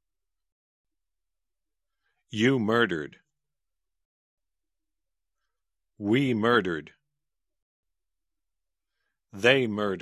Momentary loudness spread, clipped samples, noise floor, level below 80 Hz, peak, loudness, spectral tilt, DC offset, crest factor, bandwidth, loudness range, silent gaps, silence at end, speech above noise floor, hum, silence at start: 14 LU; under 0.1%; -89 dBFS; -66 dBFS; -4 dBFS; -25 LUFS; -6 dB/octave; under 0.1%; 26 dB; 13.5 kHz; 4 LU; 4.05-4.37 s, 7.62-7.83 s; 0 s; 65 dB; none; 2.3 s